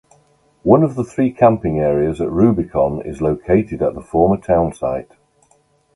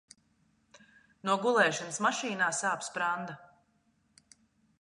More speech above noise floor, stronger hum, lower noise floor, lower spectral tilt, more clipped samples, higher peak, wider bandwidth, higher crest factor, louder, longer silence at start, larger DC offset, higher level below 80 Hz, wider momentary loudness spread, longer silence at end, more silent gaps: about the same, 42 dB vs 42 dB; neither; second, -58 dBFS vs -72 dBFS; first, -9.5 dB/octave vs -2.5 dB/octave; neither; first, 0 dBFS vs -12 dBFS; about the same, 11 kHz vs 11.5 kHz; second, 16 dB vs 22 dB; first, -17 LUFS vs -30 LUFS; second, 0.65 s vs 1.25 s; neither; first, -38 dBFS vs -82 dBFS; second, 8 LU vs 12 LU; second, 0.9 s vs 1.35 s; neither